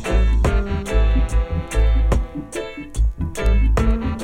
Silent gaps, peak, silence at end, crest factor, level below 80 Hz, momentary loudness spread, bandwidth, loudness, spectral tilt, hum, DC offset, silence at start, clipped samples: none; -6 dBFS; 0 s; 12 dB; -18 dBFS; 10 LU; 10.5 kHz; -21 LUFS; -6.5 dB/octave; none; under 0.1%; 0 s; under 0.1%